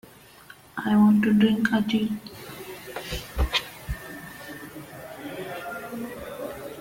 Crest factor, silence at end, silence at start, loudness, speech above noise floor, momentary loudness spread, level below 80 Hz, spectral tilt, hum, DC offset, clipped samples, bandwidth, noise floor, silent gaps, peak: 20 dB; 0 s; 0.5 s; -25 LUFS; 29 dB; 20 LU; -40 dBFS; -5.5 dB/octave; none; under 0.1%; under 0.1%; 17 kHz; -49 dBFS; none; -6 dBFS